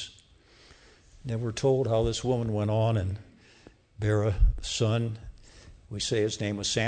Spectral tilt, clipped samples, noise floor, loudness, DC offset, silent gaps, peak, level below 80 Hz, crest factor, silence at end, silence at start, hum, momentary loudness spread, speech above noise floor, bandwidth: -5.5 dB/octave; under 0.1%; -57 dBFS; -28 LUFS; under 0.1%; none; -12 dBFS; -36 dBFS; 18 dB; 0 s; 0 s; none; 15 LU; 31 dB; 9.4 kHz